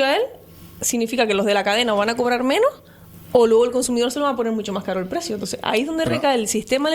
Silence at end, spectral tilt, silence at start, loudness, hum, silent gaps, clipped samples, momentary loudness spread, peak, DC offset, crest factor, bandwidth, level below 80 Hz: 0 s; -3.5 dB/octave; 0 s; -20 LUFS; none; none; under 0.1%; 8 LU; -2 dBFS; under 0.1%; 18 dB; over 20 kHz; -54 dBFS